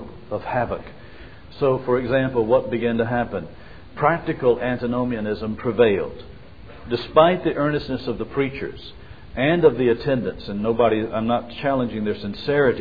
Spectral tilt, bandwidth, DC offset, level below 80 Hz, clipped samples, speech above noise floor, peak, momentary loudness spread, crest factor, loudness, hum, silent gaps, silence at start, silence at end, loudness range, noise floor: -9 dB/octave; 5 kHz; 0.6%; -46 dBFS; under 0.1%; 21 dB; -2 dBFS; 15 LU; 20 dB; -22 LUFS; none; none; 0 s; 0 s; 2 LU; -42 dBFS